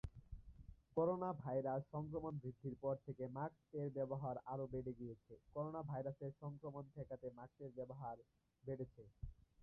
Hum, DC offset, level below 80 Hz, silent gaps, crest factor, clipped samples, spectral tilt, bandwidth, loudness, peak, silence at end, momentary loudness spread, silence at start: none; under 0.1%; -66 dBFS; none; 20 dB; under 0.1%; -10.5 dB/octave; 4 kHz; -48 LUFS; -28 dBFS; 0.2 s; 15 LU; 0.05 s